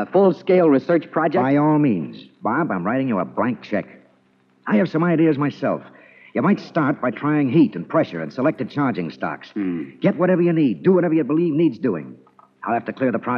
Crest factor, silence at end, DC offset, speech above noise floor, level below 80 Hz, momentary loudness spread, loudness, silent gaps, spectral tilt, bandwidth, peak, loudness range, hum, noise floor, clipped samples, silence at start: 16 dB; 0 s; under 0.1%; 40 dB; -74 dBFS; 10 LU; -20 LUFS; none; -9.5 dB/octave; 6.2 kHz; -4 dBFS; 3 LU; none; -59 dBFS; under 0.1%; 0 s